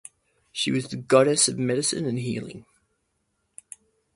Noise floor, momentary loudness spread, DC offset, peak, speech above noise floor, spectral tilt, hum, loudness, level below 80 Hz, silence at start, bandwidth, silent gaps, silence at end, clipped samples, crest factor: -74 dBFS; 20 LU; under 0.1%; -4 dBFS; 51 dB; -3.5 dB/octave; none; -23 LUFS; -64 dBFS; 0.55 s; 11.5 kHz; none; 1.55 s; under 0.1%; 22 dB